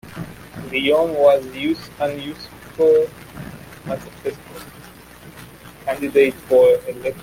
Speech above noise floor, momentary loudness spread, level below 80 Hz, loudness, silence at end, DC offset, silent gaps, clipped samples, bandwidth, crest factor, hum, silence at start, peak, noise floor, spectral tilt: 24 dB; 22 LU; -52 dBFS; -19 LUFS; 0 s; under 0.1%; none; under 0.1%; 16.5 kHz; 18 dB; none; 0.05 s; -2 dBFS; -42 dBFS; -5.5 dB/octave